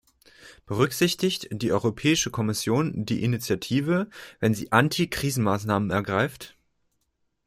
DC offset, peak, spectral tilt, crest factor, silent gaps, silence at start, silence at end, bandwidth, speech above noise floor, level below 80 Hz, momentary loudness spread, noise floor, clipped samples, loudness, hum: under 0.1%; -4 dBFS; -5 dB/octave; 22 dB; none; 0.4 s; 1 s; 16 kHz; 49 dB; -56 dBFS; 6 LU; -74 dBFS; under 0.1%; -25 LUFS; none